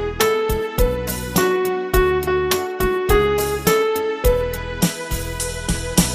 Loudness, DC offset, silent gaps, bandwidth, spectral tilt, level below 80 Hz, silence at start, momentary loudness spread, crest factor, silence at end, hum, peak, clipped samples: -20 LUFS; under 0.1%; none; 15.5 kHz; -4.5 dB/octave; -28 dBFS; 0 s; 7 LU; 18 dB; 0 s; none; 0 dBFS; under 0.1%